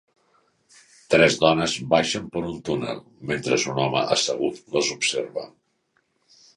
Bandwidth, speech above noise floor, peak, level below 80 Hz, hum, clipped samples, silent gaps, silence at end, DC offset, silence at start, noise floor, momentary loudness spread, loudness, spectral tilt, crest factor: 11.5 kHz; 47 dB; -2 dBFS; -56 dBFS; none; under 0.1%; none; 1.1 s; under 0.1%; 1.1 s; -70 dBFS; 13 LU; -22 LUFS; -3.5 dB/octave; 22 dB